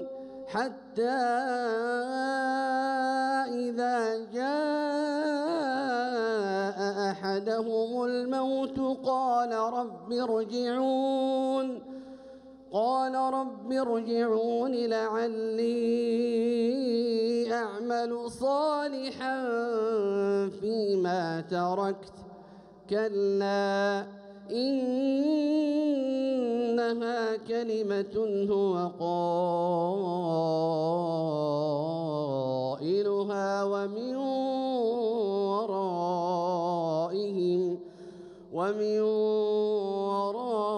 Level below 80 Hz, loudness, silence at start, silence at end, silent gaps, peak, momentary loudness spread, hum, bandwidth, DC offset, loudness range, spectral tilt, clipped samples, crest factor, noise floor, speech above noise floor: -72 dBFS; -29 LUFS; 0 s; 0 s; none; -16 dBFS; 5 LU; none; 11 kHz; under 0.1%; 2 LU; -6 dB/octave; under 0.1%; 12 dB; -51 dBFS; 23 dB